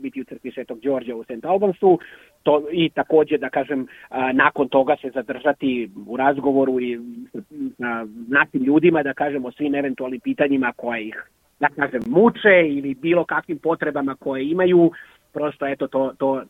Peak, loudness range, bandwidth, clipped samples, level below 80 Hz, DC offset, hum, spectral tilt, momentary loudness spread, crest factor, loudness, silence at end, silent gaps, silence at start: -2 dBFS; 3 LU; 4 kHz; under 0.1%; -62 dBFS; under 0.1%; none; -8 dB/octave; 14 LU; 20 dB; -20 LUFS; 0.05 s; none; 0 s